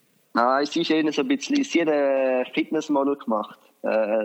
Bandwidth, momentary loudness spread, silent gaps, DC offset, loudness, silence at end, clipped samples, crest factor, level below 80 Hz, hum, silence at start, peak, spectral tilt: 8.4 kHz; 7 LU; none; under 0.1%; -23 LUFS; 0 s; under 0.1%; 16 dB; -82 dBFS; none; 0.35 s; -6 dBFS; -4 dB/octave